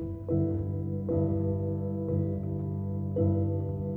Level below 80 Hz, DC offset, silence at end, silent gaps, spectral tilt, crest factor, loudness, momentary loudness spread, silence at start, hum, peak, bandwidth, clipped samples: -50 dBFS; under 0.1%; 0 s; none; -13.5 dB/octave; 14 dB; -31 LUFS; 5 LU; 0 s; none; -16 dBFS; 2.1 kHz; under 0.1%